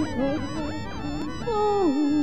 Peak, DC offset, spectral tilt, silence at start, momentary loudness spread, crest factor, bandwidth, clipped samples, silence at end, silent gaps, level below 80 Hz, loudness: -14 dBFS; 1%; -6.5 dB/octave; 0 s; 10 LU; 12 dB; 8.4 kHz; under 0.1%; 0 s; none; -42 dBFS; -26 LUFS